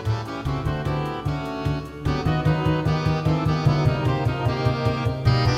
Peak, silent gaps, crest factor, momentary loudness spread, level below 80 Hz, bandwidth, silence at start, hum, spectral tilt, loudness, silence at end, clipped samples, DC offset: -6 dBFS; none; 16 dB; 6 LU; -36 dBFS; 10.5 kHz; 0 s; none; -7.5 dB/octave; -23 LUFS; 0 s; under 0.1%; under 0.1%